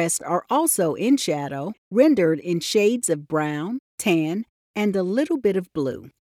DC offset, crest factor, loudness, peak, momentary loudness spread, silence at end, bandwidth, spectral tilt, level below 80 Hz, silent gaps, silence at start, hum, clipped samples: under 0.1%; 18 dB; -22 LUFS; -6 dBFS; 10 LU; 0.2 s; 17 kHz; -4.5 dB/octave; -66 dBFS; 1.78-1.91 s, 3.79-3.98 s, 4.49-4.74 s; 0 s; none; under 0.1%